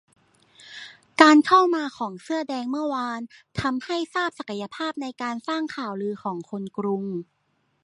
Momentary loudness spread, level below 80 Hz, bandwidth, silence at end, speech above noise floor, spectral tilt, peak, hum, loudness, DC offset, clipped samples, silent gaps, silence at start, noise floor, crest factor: 18 LU; -60 dBFS; 11 kHz; 0.6 s; 46 dB; -5 dB/octave; -2 dBFS; none; -24 LUFS; under 0.1%; under 0.1%; none; 0.6 s; -70 dBFS; 24 dB